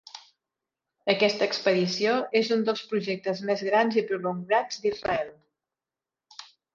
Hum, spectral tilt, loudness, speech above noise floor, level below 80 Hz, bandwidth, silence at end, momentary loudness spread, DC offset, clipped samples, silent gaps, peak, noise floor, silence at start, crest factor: none; -4.5 dB/octave; -26 LUFS; over 64 dB; -66 dBFS; 7.4 kHz; 0.3 s; 15 LU; under 0.1%; under 0.1%; none; -6 dBFS; under -90 dBFS; 0.15 s; 22 dB